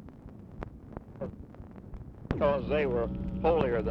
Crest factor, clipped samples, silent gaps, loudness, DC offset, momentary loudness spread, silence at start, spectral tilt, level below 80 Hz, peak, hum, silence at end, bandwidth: 22 dB; under 0.1%; none; -30 LUFS; under 0.1%; 20 LU; 0 s; -9 dB/octave; -44 dBFS; -10 dBFS; none; 0 s; 6 kHz